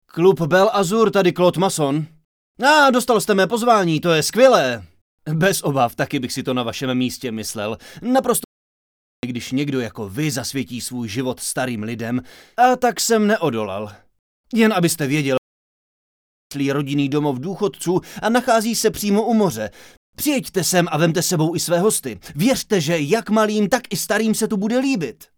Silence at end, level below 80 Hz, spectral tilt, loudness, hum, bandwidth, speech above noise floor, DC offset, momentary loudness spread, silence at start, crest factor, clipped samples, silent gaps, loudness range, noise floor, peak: 0.25 s; -56 dBFS; -4.5 dB/octave; -19 LUFS; none; over 20 kHz; over 71 dB; under 0.1%; 10 LU; 0.15 s; 20 dB; under 0.1%; 2.25-2.55 s, 5.01-5.18 s, 8.44-9.23 s, 14.19-14.44 s, 15.38-16.50 s, 19.97-20.13 s; 7 LU; under -90 dBFS; 0 dBFS